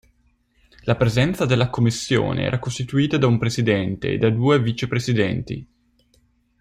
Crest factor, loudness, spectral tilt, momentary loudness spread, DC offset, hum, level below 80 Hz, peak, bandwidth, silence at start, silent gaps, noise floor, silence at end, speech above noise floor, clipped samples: 18 dB; -21 LUFS; -6 dB/octave; 6 LU; under 0.1%; none; -46 dBFS; -4 dBFS; 14 kHz; 0.85 s; none; -62 dBFS; 0.95 s; 42 dB; under 0.1%